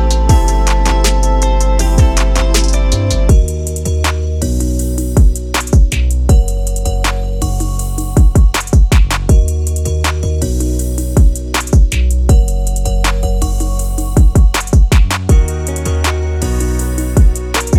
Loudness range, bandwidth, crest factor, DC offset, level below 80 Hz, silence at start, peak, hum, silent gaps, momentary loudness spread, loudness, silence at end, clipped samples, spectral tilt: 1 LU; 15.5 kHz; 10 dB; under 0.1%; -12 dBFS; 0 s; 0 dBFS; none; none; 6 LU; -14 LUFS; 0 s; under 0.1%; -5 dB/octave